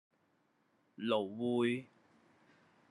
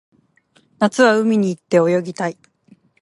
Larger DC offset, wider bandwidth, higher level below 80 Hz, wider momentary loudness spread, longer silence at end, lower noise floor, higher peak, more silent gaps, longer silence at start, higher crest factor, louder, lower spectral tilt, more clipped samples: neither; about the same, 11.5 kHz vs 11.5 kHz; second, -90 dBFS vs -70 dBFS; second, 8 LU vs 11 LU; first, 1.05 s vs 0.7 s; first, -76 dBFS vs -58 dBFS; second, -20 dBFS vs -2 dBFS; neither; first, 1 s vs 0.8 s; about the same, 20 dB vs 18 dB; second, -36 LUFS vs -17 LUFS; about the same, -6.5 dB/octave vs -6 dB/octave; neither